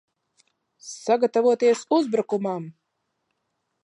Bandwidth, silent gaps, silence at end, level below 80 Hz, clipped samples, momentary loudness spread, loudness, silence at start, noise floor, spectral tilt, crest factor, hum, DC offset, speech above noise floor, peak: 10.5 kHz; none; 1.1 s; -82 dBFS; under 0.1%; 19 LU; -23 LUFS; 0.85 s; -77 dBFS; -5 dB/octave; 16 dB; none; under 0.1%; 55 dB; -8 dBFS